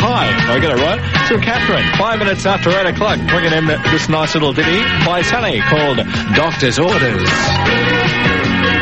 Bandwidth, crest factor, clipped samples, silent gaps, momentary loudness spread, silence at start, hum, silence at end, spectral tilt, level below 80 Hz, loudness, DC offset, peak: 8.6 kHz; 14 dB; under 0.1%; none; 2 LU; 0 s; none; 0 s; -5 dB/octave; -34 dBFS; -13 LUFS; 0.9%; 0 dBFS